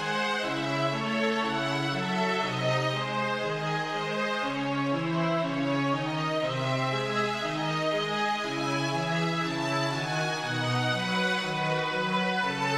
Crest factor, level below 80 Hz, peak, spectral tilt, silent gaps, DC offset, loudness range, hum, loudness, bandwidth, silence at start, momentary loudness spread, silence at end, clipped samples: 14 dB; -72 dBFS; -14 dBFS; -5 dB/octave; none; under 0.1%; 1 LU; none; -28 LUFS; 14.5 kHz; 0 s; 2 LU; 0 s; under 0.1%